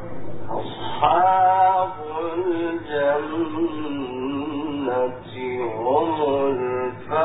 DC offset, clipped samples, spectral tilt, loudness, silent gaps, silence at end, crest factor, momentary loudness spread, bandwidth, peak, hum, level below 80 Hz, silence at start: under 0.1%; under 0.1%; -10.5 dB/octave; -23 LUFS; none; 0 s; 18 dB; 13 LU; 4 kHz; -4 dBFS; none; -54 dBFS; 0 s